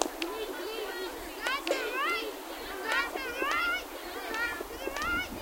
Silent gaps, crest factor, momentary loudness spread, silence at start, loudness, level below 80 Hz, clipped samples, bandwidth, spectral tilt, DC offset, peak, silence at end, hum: none; 28 dB; 9 LU; 0 s; -33 LUFS; -54 dBFS; under 0.1%; 17 kHz; -2 dB/octave; under 0.1%; -6 dBFS; 0 s; none